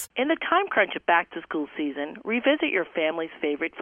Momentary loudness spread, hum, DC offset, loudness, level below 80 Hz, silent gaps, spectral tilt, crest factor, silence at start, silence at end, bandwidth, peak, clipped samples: 9 LU; none; under 0.1%; -25 LUFS; -70 dBFS; none; -3.5 dB/octave; 18 dB; 0 s; 0 s; 11 kHz; -8 dBFS; under 0.1%